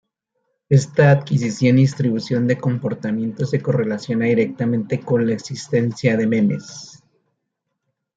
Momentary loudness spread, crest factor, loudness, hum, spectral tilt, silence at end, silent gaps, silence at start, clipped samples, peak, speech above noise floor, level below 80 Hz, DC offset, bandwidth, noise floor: 9 LU; 16 dB; -19 LUFS; none; -7 dB/octave; 1.25 s; none; 0.7 s; under 0.1%; -2 dBFS; 59 dB; -60 dBFS; under 0.1%; 7.8 kHz; -77 dBFS